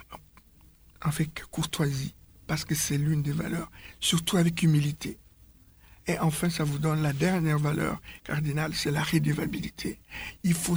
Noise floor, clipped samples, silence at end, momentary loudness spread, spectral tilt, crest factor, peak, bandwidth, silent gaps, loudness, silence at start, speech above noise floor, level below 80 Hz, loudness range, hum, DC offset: -57 dBFS; under 0.1%; 0 s; 14 LU; -5 dB/octave; 16 dB; -12 dBFS; over 20 kHz; none; -28 LUFS; 0 s; 29 dB; -50 dBFS; 3 LU; none; under 0.1%